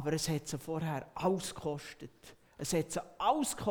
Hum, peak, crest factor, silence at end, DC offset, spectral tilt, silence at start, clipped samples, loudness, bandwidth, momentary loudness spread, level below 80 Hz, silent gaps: none; -14 dBFS; 20 dB; 0 s; under 0.1%; -4.5 dB/octave; 0 s; under 0.1%; -35 LUFS; over 20 kHz; 15 LU; -60 dBFS; none